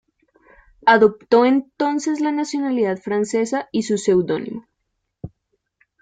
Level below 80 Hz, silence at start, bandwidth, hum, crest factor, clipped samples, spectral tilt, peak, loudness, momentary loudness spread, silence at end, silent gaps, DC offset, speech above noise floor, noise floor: -60 dBFS; 0.85 s; 9.4 kHz; none; 18 dB; under 0.1%; -5 dB/octave; -2 dBFS; -19 LUFS; 19 LU; 0.75 s; none; under 0.1%; 57 dB; -75 dBFS